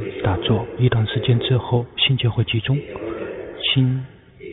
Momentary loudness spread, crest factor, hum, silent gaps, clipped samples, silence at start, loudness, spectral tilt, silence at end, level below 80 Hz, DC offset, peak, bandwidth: 12 LU; 16 dB; none; none; under 0.1%; 0 s; -20 LUFS; -5 dB/octave; 0 s; -44 dBFS; under 0.1%; -4 dBFS; 4 kHz